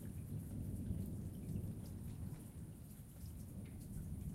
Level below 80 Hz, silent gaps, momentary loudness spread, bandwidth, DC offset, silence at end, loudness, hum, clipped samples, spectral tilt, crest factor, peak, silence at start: -56 dBFS; none; 8 LU; 16 kHz; under 0.1%; 0 s; -49 LUFS; none; under 0.1%; -7.5 dB/octave; 16 dB; -32 dBFS; 0 s